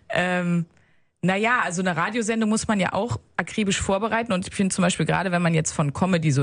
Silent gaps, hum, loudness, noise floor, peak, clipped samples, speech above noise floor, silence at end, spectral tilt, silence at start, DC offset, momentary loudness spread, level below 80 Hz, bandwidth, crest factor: none; none; -23 LUFS; -45 dBFS; -6 dBFS; under 0.1%; 22 dB; 0 s; -5 dB/octave; 0.1 s; under 0.1%; 6 LU; -50 dBFS; 10.5 kHz; 18 dB